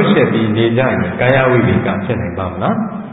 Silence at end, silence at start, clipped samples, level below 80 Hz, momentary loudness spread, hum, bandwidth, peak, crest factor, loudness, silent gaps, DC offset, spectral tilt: 0 s; 0 s; under 0.1%; -36 dBFS; 8 LU; none; 4 kHz; 0 dBFS; 14 dB; -14 LUFS; none; under 0.1%; -11 dB/octave